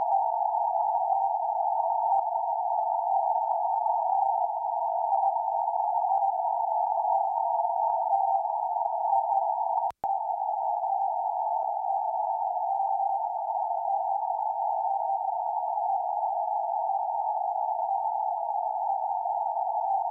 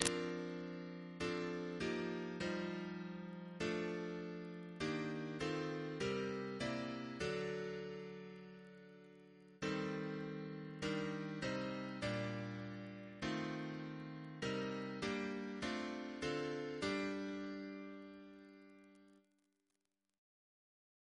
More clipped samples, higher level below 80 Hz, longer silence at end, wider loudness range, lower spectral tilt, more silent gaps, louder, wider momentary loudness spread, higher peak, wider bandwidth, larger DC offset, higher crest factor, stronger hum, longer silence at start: neither; second, -82 dBFS vs -70 dBFS; second, 0 s vs 2 s; about the same, 2 LU vs 4 LU; about the same, -5.5 dB/octave vs -5 dB/octave; neither; first, -28 LUFS vs -44 LUFS; second, 3 LU vs 13 LU; second, -16 dBFS vs -10 dBFS; second, 1.6 kHz vs 11 kHz; neither; second, 12 dB vs 34 dB; neither; about the same, 0 s vs 0 s